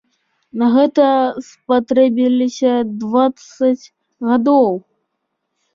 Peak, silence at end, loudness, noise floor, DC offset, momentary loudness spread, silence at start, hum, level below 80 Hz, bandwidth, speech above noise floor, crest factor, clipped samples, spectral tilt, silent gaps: -2 dBFS; 0.95 s; -15 LUFS; -73 dBFS; under 0.1%; 10 LU; 0.55 s; none; -64 dBFS; 7.4 kHz; 59 dB; 14 dB; under 0.1%; -6 dB/octave; none